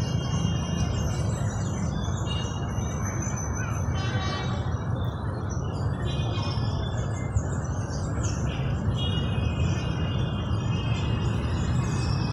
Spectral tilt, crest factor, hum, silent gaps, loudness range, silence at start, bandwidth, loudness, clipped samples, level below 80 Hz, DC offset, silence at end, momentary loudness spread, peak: -5.5 dB/octave; 14 dB; none; none; 2 LU; 0 s; 12 kHz; -28 LUFS; under 0.1%; -36 dBFS; under 0.1%; 0 s; 3 LU; -12 dBFS